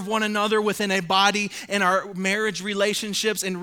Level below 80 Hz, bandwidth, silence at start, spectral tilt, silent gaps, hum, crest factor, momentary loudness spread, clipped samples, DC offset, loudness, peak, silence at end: -66 dBFS; 19 kHz; 0 s; -3 dB/octave; none; none; 18 dB; 5 LU; under 0.1%; under 0.1%; -22 LUFS; -4 dBFS; 0 s